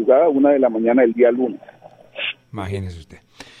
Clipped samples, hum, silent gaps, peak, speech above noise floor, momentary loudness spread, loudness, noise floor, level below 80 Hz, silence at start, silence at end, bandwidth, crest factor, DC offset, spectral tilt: under 0.1%; none; none; -2 dBFS; 22 dB; 17 LU; -18 LUFS; -39 dBFS; -54 dBFS; 0 s; 0.45 s; 9.8 kHz; 16 dB; under 0.1%; -7.5 dB/octave